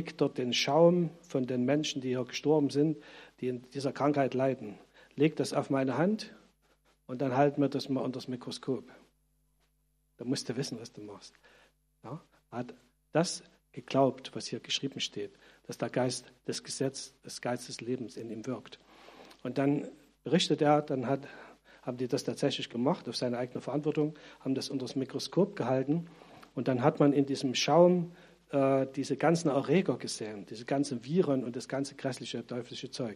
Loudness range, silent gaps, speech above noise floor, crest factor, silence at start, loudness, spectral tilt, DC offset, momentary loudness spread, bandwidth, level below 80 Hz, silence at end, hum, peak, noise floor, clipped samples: 10 LU; none; 42 dB; 22 dB; 0 s; -31 LUFS; -5.5 dB/octave; under 0.1%; 16 LU; 13.5 kHz; -74 dBFS; 0 s; none; -10 dBFS; -74 dBFS; under 0.1%